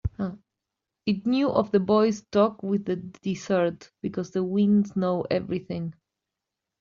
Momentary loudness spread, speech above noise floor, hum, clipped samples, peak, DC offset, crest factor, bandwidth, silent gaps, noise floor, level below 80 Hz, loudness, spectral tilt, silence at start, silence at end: 12 LU; 61 dB; none; under 0.1%; -8 dBFS; under 0.1%; 18 dB; 7.2 kHz; none; -86 dBFS; -52 dBFS; -26 LUFS; -6.5 dB/octave; 0.05 s; 0.9 s